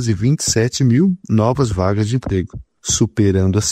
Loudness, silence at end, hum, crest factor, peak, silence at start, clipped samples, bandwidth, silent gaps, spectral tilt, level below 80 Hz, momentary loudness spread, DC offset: -16 LUFS; 0 s; none; 14 dB; -2 dBFS; 0 s; under 0.1%; 14.5 kHz; none; -5.5 dB/octave; -38 dBFS; 7 LU; under 0.1%